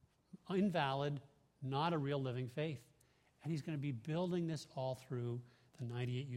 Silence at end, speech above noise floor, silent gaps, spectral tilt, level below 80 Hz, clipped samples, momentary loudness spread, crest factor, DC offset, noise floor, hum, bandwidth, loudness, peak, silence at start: 0 s; 33 dB; none; -7 dB/octave; -76 dBFS; under 0.1%; 12 LU; 20 dB; under 0.1%; -73 dBFS; none; 13 kHz; -41 LUFS; -22 dBFS; 0.35 s